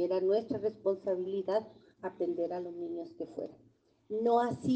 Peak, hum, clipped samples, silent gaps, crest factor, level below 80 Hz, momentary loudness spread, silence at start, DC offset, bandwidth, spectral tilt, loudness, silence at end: -16 dBFS; none; under 0.1%; none; 16 dB; -76 dBFS; 14 LU; 0 s; under 0.1%; 8.8 kHz; -7.5 dB/octave; -34 LUFS; 0 s